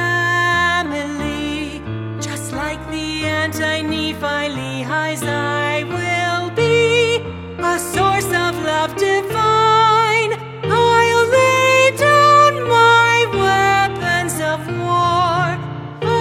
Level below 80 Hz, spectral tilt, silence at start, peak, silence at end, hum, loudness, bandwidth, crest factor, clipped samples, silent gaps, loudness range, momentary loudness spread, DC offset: -44 dBFS; -4 dB/octave; 0 s; 0 dBFS; 0 s; none; -16 LUFS; 16.5 kHz; 16 dB; under 0.1%; none; 9 LU; 12 LU; under 0.1%